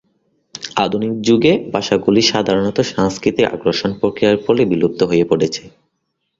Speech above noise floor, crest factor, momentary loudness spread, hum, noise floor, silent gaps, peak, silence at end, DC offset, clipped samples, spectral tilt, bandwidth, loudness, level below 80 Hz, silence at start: 56 dB; 16 dB; 6 LU; none; -71 dBFS; none; 0 dBFS; 0.7 s; under 0.1%; under 0.1%; -5 dB/octave; 7.8 kHz; -16 LUFS; -50 dBFS; 0.55 s